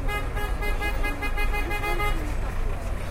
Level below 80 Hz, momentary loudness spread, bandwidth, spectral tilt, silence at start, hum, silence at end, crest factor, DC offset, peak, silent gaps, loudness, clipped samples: -26 dBFS; 5 LU; 16 kHz; -5 dB/octave; 0 s; none; 0 s; 12 dB; under 0.1%; -12 dBFS; none; -29 LUFS; under 0.1%